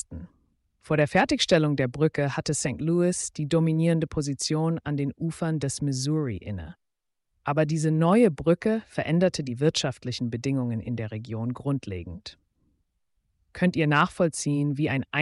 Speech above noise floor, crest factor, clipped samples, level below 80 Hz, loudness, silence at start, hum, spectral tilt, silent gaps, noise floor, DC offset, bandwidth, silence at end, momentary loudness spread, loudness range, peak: 54 dB; 16 dB; under 0.1%; -54 dBFS; -26 LUFS; 0.1 s; none; -5.5 dB/octave; none; -79 dBFS; under 0.1%; 11.5 kHz; 0 s; 12 LU; 6 LU; -10 dBFS